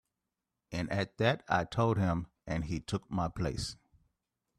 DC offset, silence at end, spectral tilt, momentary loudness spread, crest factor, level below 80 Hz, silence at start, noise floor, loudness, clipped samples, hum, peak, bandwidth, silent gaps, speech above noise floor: under 0.1%; 0.85 s; -6 dB/octave; 10 LU; 20 dB; -54 dBFS; 0.7 s; -88 dBFS; -34 LUFS; under 0.1%; none; -14 dBFS; 13 kHz; none; 55 dB